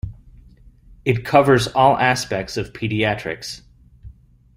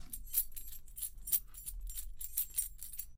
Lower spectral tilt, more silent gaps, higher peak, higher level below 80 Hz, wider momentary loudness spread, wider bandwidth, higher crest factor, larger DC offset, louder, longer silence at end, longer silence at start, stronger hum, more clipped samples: first, -5 dB/octave vs 0 dB/octave; neither; first, 0 dBFS vs -16 dBFS; first, -44 dBFS vs -50 dBFS; first, 16 LU vs 12 LU; about the same, 16 kHz vs 16.5 kHz; about the same, 20 dB vs 24 dB; neither; first, -19 LUFS vs -38 LUFS; first, 0.45 s vs 0 s; about the same, 0.05 s vs 0 s; neither; neither